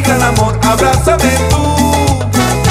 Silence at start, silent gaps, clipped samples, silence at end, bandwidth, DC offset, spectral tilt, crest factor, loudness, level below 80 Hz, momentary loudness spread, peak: 0 s; none; under 0.1%; 0 s; 16 kHz; under 0.1%; -5 dB/octave; 10 dB; -11 LUFS; -20 dBFS; 2 LU; 0 dBFS